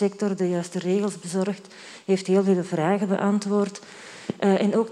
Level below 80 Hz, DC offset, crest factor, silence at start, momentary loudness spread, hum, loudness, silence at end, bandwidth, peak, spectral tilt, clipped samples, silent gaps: -76 dBFS; under 0.1%; 16 dB; 0 s; 16 LU; none; -24 LUFS; 0 s; 11.5 kHz; -8 dBFS; -6.5 dB/octave; under 0.1%; none